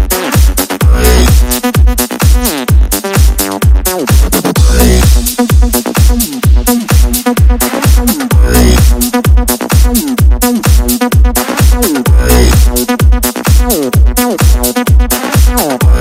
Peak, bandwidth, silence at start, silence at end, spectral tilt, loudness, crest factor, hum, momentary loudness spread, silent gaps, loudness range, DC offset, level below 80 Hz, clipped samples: 0 dBFS; 16.5 kHz; 0 s; 0 s; -5 dB/octave; -9 LUFS; 8 dB; none; 3 LU; none; 1 LU; under 0.1%; -10 dBFS; 2%